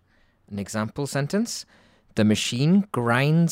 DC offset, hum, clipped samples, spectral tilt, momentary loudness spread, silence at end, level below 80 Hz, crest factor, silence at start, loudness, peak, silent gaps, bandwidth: under 0.1%; none; under 0.1%; -5.5 dB/octave; 13 LU; 0 s; -60 dBFS; 16 dB; 0.5 s; -24 LUFS; -8 dBFS; none; 16 kHz